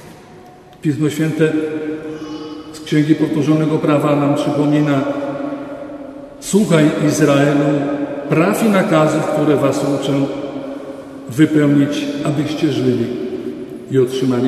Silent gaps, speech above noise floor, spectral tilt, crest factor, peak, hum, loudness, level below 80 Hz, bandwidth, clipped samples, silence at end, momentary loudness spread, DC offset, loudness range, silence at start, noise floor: none; 25 dB; -6.5 dB/octave; 16 dB; 0 dBFS; none; -16 LUFS; -54 dBFS; 13.5 kHz; under 0.1%; 0 s; 15 LU; under 0.1%; 3 LU; 0 s; -40 dBFS